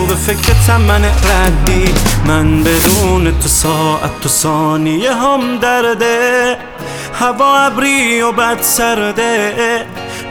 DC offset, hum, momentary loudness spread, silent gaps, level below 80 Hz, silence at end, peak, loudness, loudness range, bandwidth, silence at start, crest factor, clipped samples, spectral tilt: under 0.1%; none; 6 LU; none; -20 dBFS; 0 s; 0 dBFS; -11 LUFS; 2 LU; over 20 kHz; 0 s; 12 dB; under 0.1%; -4 dB/octave